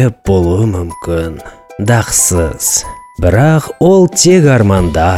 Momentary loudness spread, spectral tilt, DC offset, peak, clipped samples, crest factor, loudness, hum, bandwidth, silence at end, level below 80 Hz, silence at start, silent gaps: 12 LU; -5 dB/octave; under 0.1%; 0 dBFS; under 0.1%; 10 dB; -10 LUFS; none; 16.5 kHz; 0 s; -28 dBFS; 0 s; none